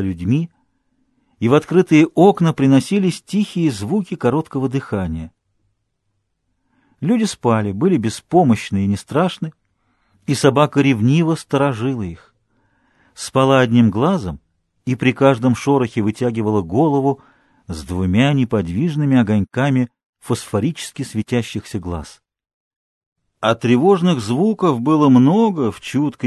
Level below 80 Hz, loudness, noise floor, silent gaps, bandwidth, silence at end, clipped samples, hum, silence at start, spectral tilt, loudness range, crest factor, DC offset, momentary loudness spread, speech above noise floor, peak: -42 dBFS; -17 LUFS; -70 dBFS; 20.06-20.13 s, 22.54-23.16 s; 12.5 kHz; 0 s; under 0.1%; none; 0 s; -7 dB/octave; 7 LU; 18 dB; under 0.1%; 13 LU; 54 dB; 0 dBFS